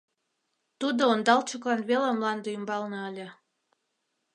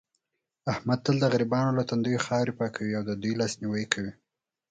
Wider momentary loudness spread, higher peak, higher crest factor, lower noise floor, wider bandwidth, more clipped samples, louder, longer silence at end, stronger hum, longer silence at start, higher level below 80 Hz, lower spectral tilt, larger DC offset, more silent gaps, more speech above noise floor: first, 13 LU vs 7 LU; about the same, -6 dBFS vs -6 dBFS; about the same, 22 dB vs 24 dB; about the same, -79 dBFS vs -82 dBFS; first, 10.5 kHz vs 9.4 kHz; neither; about the same, -27 LUFS vs -28 LUFS; first, 1 s vs 0.6 s; neither; first, 0.8 s vs 0.65 s; second, -84 dBFS vs -62 dBFS; second, -4 dB/octave vs -5.5 dB/octave; neither; neither; about the same, 52 dB vs 55 dB